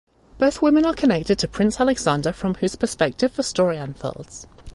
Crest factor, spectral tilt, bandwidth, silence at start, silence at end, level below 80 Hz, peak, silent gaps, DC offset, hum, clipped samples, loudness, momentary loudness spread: 16 dB; -5 dB/octave; 11.5 kHz; 0.35 s; 0.05 s; -46 dBFS; -4 dBFS; none; under 0.1%; none; under 0.1%; -21 LUFS; 13 LU